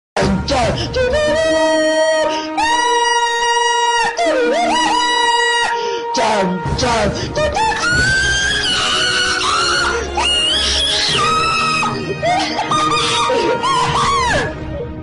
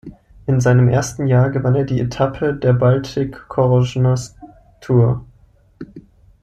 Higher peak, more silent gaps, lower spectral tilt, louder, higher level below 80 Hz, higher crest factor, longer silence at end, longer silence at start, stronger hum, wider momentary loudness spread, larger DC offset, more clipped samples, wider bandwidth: about the same, -4 dBFS vs -2 dBFS; neither; second, -3 dB/octave vs -7.5 dB/octave; first, -14 LUFS vs -17 LUFS; first, -34 dBFS vs -42 dBFS; about the same, 12 dB vs 16 dB; second, 0 s vs 0.4 s; about the same, 0.15 s vs 0.05 s; neither; second, 5 LU vs 12 LU; neither; neither; first, 11 kHz vs 8.8 kHz